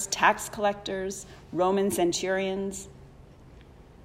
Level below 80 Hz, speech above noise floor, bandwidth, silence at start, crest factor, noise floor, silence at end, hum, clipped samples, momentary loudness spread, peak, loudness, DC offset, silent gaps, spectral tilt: -54 dBFS; 23 dB; 16 kHz; 0 s; 20 dB; -50 dBFS; 0 s; none; under 0.1%; 14 LU; -8 dBFS; -27 LUFS; under 0.1%; none; -3.5 dB/octave